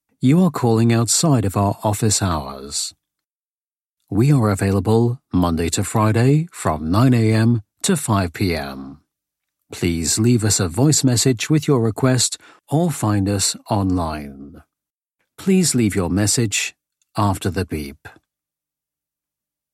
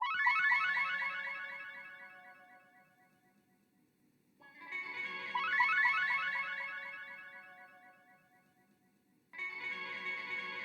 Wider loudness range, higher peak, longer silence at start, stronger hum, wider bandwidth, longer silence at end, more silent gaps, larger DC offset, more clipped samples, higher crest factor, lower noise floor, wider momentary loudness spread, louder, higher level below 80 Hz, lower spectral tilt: second, 4 LU vs 14 LU; first, -4 dBFS vs -18 dBFS; first, 0.2 s vs 0 s; first, 50 Hz at -45 dBFS vs none; second, 15.5 kHz vs 19 kHz; first, 1.65 s vs 0 s; first, 3.35-3.54 s, 3.67-3.76 s, 3.93-3.97 s vs none; neither; neither; about the same, 16 dB vs 20 dB; first, under -90 dBFS vs -73 dBFS; second, 10 LU vs 23 LU; first, -18 LUFS vs -34 LUFS; first, -48 dBFS vs -90 dBFS; first, -5 dB/octave vs -1.5 dB/octave